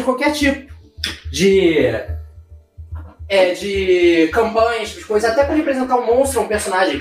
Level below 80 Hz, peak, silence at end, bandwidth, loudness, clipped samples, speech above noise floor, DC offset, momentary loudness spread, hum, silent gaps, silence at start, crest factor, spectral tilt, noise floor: -36 dBFS; -2 dBFS; 0 s; 16 kHz; -16 LUFS; under 0.1%; 26 dB; under 0.1%; 14 LU; none; none; 0 s; 14 dB; -4.5 dB/octave; -42 dBFS